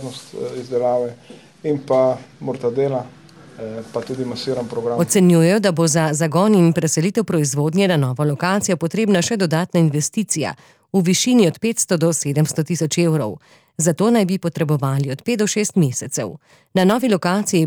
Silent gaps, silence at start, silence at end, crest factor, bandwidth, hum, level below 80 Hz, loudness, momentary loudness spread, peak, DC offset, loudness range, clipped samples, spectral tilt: none; 0 s; 0 s; 14 dB; 19.5 kHz; none; -62 dBFS; -18 LUFS; 13 LU; -4 dBFS; under 0.1%; 6 LU; under 0.1%; -5 dB/octave